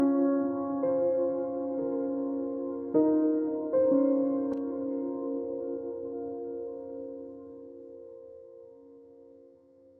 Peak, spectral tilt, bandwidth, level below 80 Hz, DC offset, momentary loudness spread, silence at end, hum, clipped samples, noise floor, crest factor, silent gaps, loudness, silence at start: -14 dBFS; -10.5 dB/octave; 2.2 kHz; -72 dBFS; under 0.1%; 21 LU; 0.6 s; none; under 0.1%; -58 dBFS; 18 dB; none; -30 LUFS; 0 s